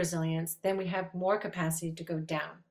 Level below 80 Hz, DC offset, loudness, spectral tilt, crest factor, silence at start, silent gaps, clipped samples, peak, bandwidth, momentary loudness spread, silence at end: -70 dBFS; under 0.1%; -33 LUFS; -5 dB/octave; 16 dB; 0 s; none; under 0.1%; -16 dBFS; 16 kHz; 5 LU; 0.1 s